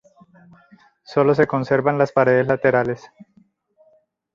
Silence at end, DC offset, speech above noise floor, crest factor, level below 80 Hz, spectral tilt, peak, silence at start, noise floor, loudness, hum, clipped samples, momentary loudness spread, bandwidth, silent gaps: 1.1 s; under 0.1%; 42 dB; 18 dB; -58 dBFS; -8 dB/octave; -2 dBFS; 1.1 s; -60 dBFS; -18 LUFS; none; under 0.1%; 8 LU; 7.4 kHz; none